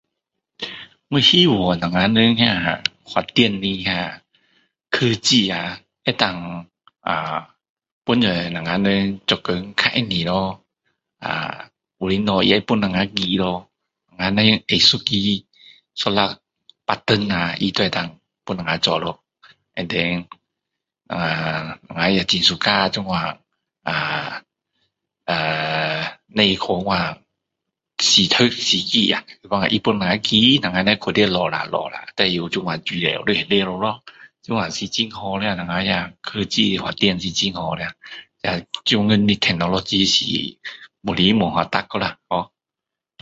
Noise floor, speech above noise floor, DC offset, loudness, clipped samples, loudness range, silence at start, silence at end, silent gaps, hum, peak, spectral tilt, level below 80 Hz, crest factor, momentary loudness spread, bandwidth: -86 dBFS; 66 dB; under 0.1%; -19 LUFS; under 0.1%; 5 LU; 0.6 s; 0.75 s; 7.69-7.76 s, 7.92-8.02 s; none; 0 dBFS; -4 dB/octave; -50 dBFS; 20 dB; 15 LU; 8 kHz